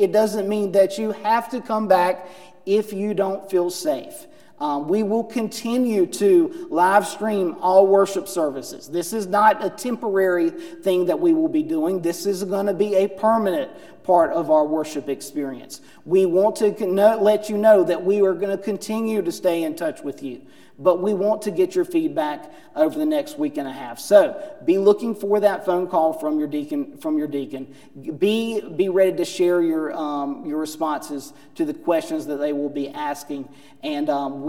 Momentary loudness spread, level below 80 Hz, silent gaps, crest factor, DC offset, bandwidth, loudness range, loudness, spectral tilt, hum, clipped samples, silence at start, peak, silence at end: 12 LU; -72 dBFS; none; 20 dB; 0.3%; 17 kHz; 5 LU; -21 LUFS; -5.5 dB/octave; none; under 0.1%; 0 s; -2 dBFS; 0 s